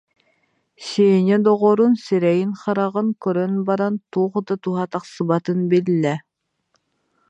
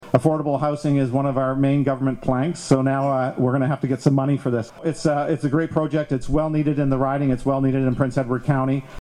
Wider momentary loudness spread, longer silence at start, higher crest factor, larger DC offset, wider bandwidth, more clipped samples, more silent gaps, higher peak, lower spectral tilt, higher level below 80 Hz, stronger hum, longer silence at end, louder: first, 9 LU vs 4 LU; first, 0.8 s vs 0 s; about the same, 16 dB vs 16 dB; neither; second, 9 kHz vs 11 kHz; neither; neither; about the same, -4 dBFS vs -4 dBFS; about the same, -7.5 dB/octave vs -8 dB/octave; second, -70 dBFS vs -42 dBFS; neither; first, 1.1 s vs 0 s; about the same, -19 LUFS vs -21 LUFS